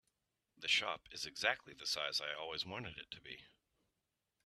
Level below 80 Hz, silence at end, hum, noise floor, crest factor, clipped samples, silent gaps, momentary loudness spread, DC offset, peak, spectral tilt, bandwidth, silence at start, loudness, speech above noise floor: -76 dBFS; 1 s; none; -88 dBFS; 26 dB; under 0.1%; none; 16 LU; under 0.1%; -18 dBFS; -1 dB/octave; 13.5 kHz; 0.6 s; -39 LUFS; 46 dB